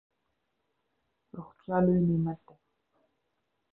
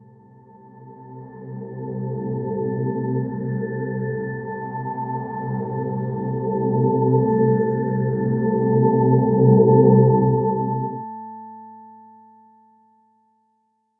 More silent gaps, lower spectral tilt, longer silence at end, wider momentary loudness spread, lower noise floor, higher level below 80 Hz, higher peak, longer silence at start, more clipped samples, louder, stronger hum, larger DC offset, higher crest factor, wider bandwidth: neither; second, -13 dB/octave vs -15.5 dB/octave; second, 1.35 s vs 2.05 s; about the same, 22 LU vs 20 LU; first, -80 dBFS vs -68 dBFS; about the same, -60 dBFS vs -56 dBFS; second, -14 dBFS vs -2 dBFS; first, 1.35 s vs 0.65 s; neither; second, -28 LUFS vs -20 LUFS; neither; neither; about the same, 20 dB vs 18 dB; first, 2.7 kHz vs 1.9 kHz